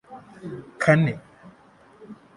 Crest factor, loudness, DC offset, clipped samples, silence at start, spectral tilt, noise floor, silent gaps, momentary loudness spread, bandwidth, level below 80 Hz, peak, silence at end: 24 dB; -21 LUFS; under 0.1%; under 0.1%; 0.1 s; -7.5 dB/octave; -53 dBFS; none; 27 LU; 11.5 kHz; -60 dBFS; -2 dBFS; 0.2 s